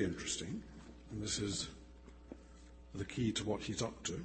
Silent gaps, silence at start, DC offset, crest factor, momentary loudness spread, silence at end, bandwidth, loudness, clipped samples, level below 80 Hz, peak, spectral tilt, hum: none; 0 s; under 0.1%; 18 dB; 20 LU; 0 s; 8.8 kHz; -40 LUFS; under 0.1%; -58 dBFS; -24 dBFS; -4 dB/octave; none